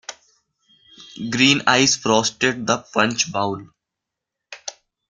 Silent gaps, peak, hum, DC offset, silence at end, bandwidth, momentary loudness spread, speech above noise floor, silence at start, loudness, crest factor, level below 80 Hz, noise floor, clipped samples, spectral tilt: none; 0 dBFS; none; under 0.1%; 0.4 s; 10.5 kHz; 19 LU; 64 dB; 0.1 s; -18 LUFS; 22 dB; -60 dBFS; -84 dBFS; under 0.1%; -2.5 dB/octave